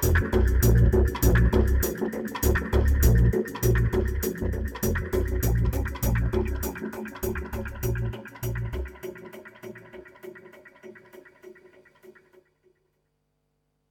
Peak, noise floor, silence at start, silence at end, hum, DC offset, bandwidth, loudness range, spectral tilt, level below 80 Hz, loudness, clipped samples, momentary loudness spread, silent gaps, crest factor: -8 dBFS; -74 dBFS; 0 s; 2.4 s; none; under 0.1%; 19.5 kHz; 18 LU; -6.5 dB/octave; -28 dBFS; -25 LUFS; under 0.1%; 22 LU; none; 18 dB